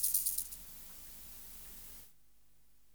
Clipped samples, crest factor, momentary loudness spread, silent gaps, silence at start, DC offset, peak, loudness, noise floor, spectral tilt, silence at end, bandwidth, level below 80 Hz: under 0.1%; 26 dB; 19 LU; none; 0 s; 0.1%; -16 dBFS; -39 LUFS; -72 dBFS; 0.5 dB/octave; 0.85 s; over 20 kHz; -64 dBFS